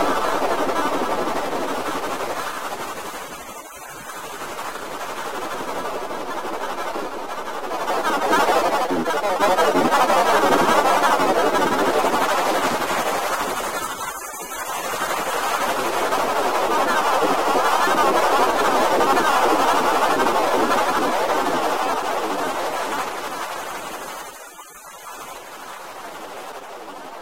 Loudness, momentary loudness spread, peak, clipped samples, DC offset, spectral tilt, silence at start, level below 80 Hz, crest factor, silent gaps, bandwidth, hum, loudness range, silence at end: -21 LUFS; 17 LU; -4 dBFS; under 0.1%; under 0.1%; -2.5 dB/octave; 0 s; -54 dBFS; 16 dB; none; 16 kHz; none; 12 LU; 0 s